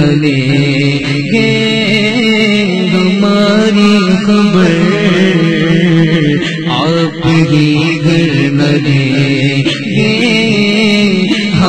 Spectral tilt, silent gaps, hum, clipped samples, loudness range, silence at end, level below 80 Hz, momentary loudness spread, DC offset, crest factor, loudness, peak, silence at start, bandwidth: -6 dB/octave; none; none; under 0.1%; 1 LU; 0 s; -42 dBFS; 3 LU; 1%; 10 dB; -10 LUFS; 0 dBFS; 0 s; 9.2 kHz